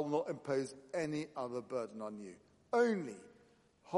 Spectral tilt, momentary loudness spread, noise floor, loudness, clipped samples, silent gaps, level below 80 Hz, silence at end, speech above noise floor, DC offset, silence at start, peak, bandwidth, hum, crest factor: -6 dB/octave; 15 LU; -68 dBFS; -39 LUFS; under 0.1%; none; -82 dBFS; 0 s; 30 dB; under 0.1%; 0 s; -20 dBFS; 11.5 kHz; none; 20 dB